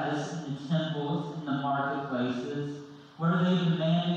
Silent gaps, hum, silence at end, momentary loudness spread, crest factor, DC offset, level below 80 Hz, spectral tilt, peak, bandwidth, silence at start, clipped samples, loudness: none; none; 0 s; 10 LU; 12 dB; under 0.1%; -72 dBFS; -7 dB/octave; -16 dBFS; 7.8 kHz; 0 s; under 0.1%; -30 LUFS